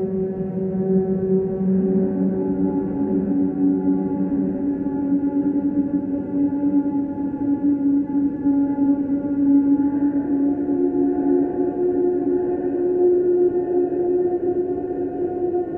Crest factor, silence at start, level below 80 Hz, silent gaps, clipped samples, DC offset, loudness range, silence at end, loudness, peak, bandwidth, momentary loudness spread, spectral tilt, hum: 12 dB; 0 s; -50 dBFS; none; under 0.1%; under 0.1%; 2 LU; 0 s; -21 LUFS; -8 dBFS; 2.1 kHz; 5 LU; -13.5 dB/octave; none